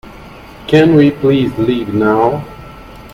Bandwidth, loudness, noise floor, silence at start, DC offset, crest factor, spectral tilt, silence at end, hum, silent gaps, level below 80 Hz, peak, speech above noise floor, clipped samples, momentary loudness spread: 15 kHz; -12 LUFS; -34 dBFS; 0.05 s; under 0.1%; 14 dB; -8 dB/octave; 0.05 s; none; none; -40 dBFS; 0 dBFS; 23 dB; under 0.1%; 20 LU